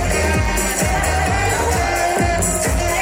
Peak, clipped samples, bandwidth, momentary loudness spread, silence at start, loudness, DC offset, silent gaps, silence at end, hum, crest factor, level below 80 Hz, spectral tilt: -4 dBFS; under 0.1%; 16.5 kHz; 1 LU; 0 s; -17 LUFS; under 0.1%; none; 0 s; none; 12 dB; -24 dBFS; -4 dB/octave